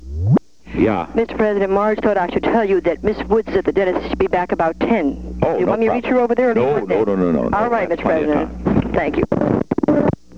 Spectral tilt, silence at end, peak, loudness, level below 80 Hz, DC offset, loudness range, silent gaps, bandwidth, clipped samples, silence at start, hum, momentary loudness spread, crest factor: -8.5 dB/octave; 0 s; 0 dBFS; -18 LUFS; -36 dBFS; 0.7%; 1 LU; none; 7.6 kHz; under 0.1%; 0 s; none; 3 LU; 16 dB